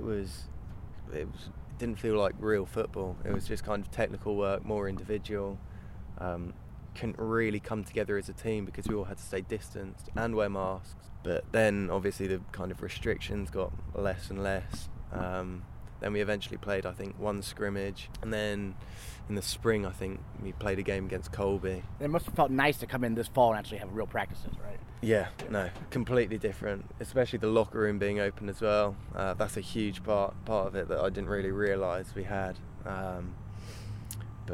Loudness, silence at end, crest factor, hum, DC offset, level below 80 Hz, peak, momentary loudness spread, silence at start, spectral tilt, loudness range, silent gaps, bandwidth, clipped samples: -33 LUFS; 0 s; 22 dB; none; under 0.1%; -46 dBFS; -10 dBFS; 14 LU; 0 s; -6 dB/octave; 5 LU; none; 16 kHz; under 0.1%